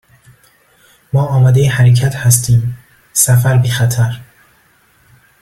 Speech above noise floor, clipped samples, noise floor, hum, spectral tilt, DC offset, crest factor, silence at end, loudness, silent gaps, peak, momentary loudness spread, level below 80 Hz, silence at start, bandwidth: 41 dB; under 0.1%; -52 dBFS; none; -5 dB/octave; under 0.1%; 14 dB; 1.2 s; -12 LUFS; none; 0 dBFS; 8 LU; -42 dBFS; 1.15 s; 15.5 kHz